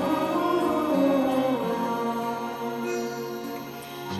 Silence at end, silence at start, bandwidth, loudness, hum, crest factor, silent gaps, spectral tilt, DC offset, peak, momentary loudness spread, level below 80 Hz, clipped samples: 0 s; 0 s; 14.5 kHz; -27 LUFS; none; 16 dB; none; -5.5 dB/octave; under 0.1%; -12 dBFS; 12 LU; -64 dBFS; under 0.1%